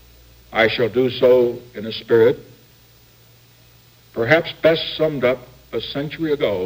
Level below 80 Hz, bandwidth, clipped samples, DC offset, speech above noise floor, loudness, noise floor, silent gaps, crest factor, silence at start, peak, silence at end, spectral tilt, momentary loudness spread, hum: -52 dBFS; 16.5 kHz; under 0.1%; under 0.1%; 32 dB; -19 LUFS; -50 dBFS; none; 20 dB; 0.5 s; 0 dBFS; 0 s; -6.5 dB/octave; 14 LU; none